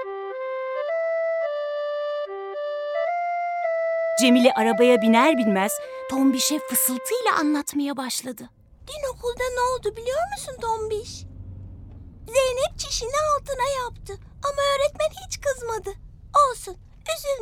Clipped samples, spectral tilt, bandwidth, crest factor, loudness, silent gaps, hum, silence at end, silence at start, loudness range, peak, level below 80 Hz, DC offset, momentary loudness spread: under 0.1%; -3 dB/octave; 19 kHz; 20 dB; -23 LUFS; none; none; 0 s; 0 s; 8 LU; -4 dBFS; -48 dBFS; under 0.1%; 18 LU